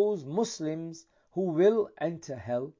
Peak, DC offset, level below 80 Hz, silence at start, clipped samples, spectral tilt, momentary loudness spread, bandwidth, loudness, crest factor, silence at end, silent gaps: -12 dBFS; under 0.1%; -68 dBFS; 0 s; under 0.1%; -6 dB/octave; 15 LU; 7.6 kHz; -30 LUFS; 16 dB; 0.1 s; none